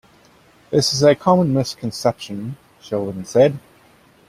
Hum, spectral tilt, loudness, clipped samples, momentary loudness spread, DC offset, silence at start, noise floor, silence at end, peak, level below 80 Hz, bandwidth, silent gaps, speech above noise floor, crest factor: none; -5.5 dB/octave; -18 LUFS; under 0.1%; 15 LU; under 0.1%; 0.7 s; -52 dBFS; 0.7 s; -2 dBFS; -54 dBFS; 15.5 kHz; none; 34 dB; 18 dB